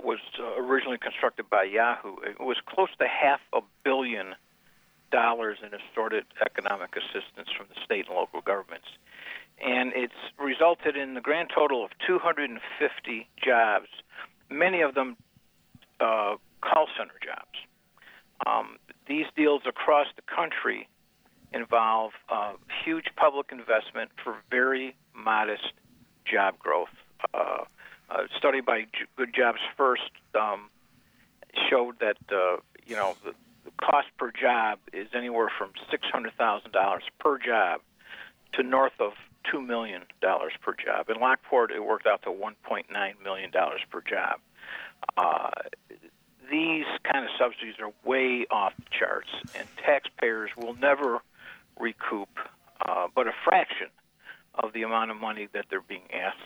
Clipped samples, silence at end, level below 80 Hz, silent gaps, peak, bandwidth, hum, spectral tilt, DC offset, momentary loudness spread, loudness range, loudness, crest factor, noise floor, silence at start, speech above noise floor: under 0.1%; 0 s; -74 dBFS; none; -10 dBFS; over 20 kHz; none; -4.5 dB/octave; under 0.1%; 13 LU; 3 LU; -28 LUFS; 20 dB; -64 dBFS; 0 s; 36 dB